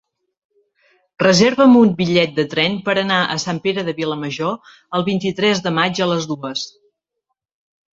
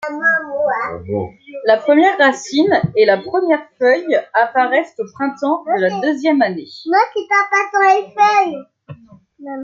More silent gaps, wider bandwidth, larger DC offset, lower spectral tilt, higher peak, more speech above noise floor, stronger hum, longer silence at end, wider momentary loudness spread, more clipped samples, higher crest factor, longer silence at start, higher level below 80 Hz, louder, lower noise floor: neither; about the same, 7.8 kHz vs 7.8 kHz; neither; about the same, -5 dB/octave vs -5 dB/octave; about the same, 0 dBFS vs 0 dBFS; first, 60 dB vs 28 dB; neither; first, 1.25 s vs 0 s; about the same, 12 LU vs 10 LU; neither; about the same, 18 dB vs 16 dB; first, 1.2 s vs 0 s; about the same, -56 dBFS vs -60 dBFS; about the same, -17 LUFS vs -15 LUFS; first, -77 dBFS vs -43 dBFS